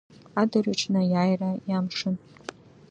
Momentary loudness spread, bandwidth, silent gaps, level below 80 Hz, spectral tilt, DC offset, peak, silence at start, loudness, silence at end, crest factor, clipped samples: 16 LU; 8.6 kHz; none; -68 dBFS; -6 dB/octave; under 0.1%; -8 dBFS; 0.35 s; -26 LUFS; 0.75 s; 18 dB; under 0.1%